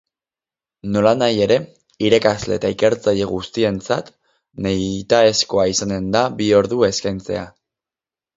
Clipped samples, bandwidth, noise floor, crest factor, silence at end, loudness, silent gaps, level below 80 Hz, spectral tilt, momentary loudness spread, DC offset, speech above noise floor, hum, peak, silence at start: under 0.1%; 7.8 kHz; under -90 dBFS; 18 dB; 0.85 s; -18 LUFS; none; -48 dBFS; -4.5 dB/octave; 10 LU; under 0.1%; over 73 dB; none; 0 dBFS; 0.85 s